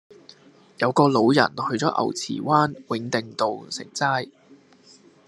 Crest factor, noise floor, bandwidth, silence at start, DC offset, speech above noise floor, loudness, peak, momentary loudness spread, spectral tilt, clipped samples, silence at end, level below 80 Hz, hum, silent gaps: 22 dB; -53 dBFS; 12 kHz; 0.8 s; under 0.1%; 31 dB; -23 LUFS; -2 dBFS; 11 LU; -5 dB/octave; under 0.1%; 0.75 s; -68 dBFS; none; none